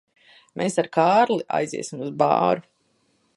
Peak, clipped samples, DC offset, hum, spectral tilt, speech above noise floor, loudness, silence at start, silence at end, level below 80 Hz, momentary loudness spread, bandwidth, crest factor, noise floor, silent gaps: -4 dBFS; under 0.1%; under 0.1%; none; -5 dB/octave; 45 dB; -22 LUFS; 0.55 s; 0.75 s; -70 dBFS; 12 LU; 11.5 kHz; 20 dB; -67 dBFS; none